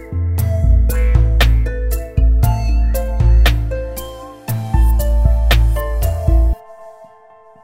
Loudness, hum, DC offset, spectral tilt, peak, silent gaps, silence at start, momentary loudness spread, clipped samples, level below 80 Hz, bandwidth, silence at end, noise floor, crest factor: -16 LUFS; none; 0.2%; -6 dB/octave; 0 dBFS; none; 0 s; 10 LU; under 0.1%; -14 dBFS; 16.5 kHz; 0.6 s; -44 dBFS; 14 dB